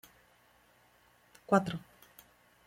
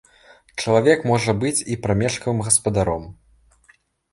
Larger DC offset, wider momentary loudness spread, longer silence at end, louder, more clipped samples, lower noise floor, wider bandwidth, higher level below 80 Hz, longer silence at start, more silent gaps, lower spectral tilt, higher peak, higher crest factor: neither; first, 27 LU vs 9 LU; about the same, 0.9 s vs 1 s; second, -32 LUFS vs -20 LUFS; neither; first, -66 dBFS vs -58 dBFS; first, 16.5 kHz vs 11.5 kHz; second, -70 dBFS vs -44 dBFS; first, 1.5 s vs 0.55 s; neither; first, -6.5 dB/octave vs -4.5 dB/octave; second, -12 dBFS vs -2 dBFS; first, 26 dB vs 18 dB